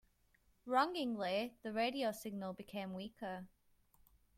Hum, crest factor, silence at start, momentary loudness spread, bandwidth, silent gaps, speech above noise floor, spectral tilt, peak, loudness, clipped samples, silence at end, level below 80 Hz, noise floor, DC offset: none; 22 dB; 0.65 s; 12 LU; 16 kHz; none; 34 dB; -5 dB/octave; -20 dBFS; -40 LUFS; under 0.1%; 0.9 s; -74 dBFS; -74 dBFS; under 0.1%